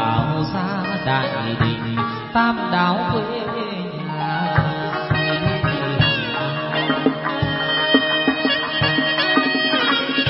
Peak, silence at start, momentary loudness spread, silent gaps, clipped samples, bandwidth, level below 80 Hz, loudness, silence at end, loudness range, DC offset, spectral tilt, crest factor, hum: 0 dBFS; 0 s; 7 LU; none; under 0.1%; 5.8 kHz; -44 dBFS; -19 LUFS; 0 s; 3 LU; under 0.1%; -10 dB/octave; 20 dB; none